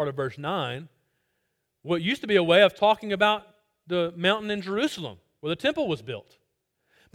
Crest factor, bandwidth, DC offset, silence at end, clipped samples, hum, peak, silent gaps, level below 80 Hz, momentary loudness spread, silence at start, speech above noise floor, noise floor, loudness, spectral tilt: 22 dB; 16 kHz; under 0.1%; 0.95 s; under 0.1%; none; -6 dBFS; none; -66 dBFS; 17 LU; 0 s; 52 dB; -77 dBFS; -25 LUFS; -5.5 dB/octave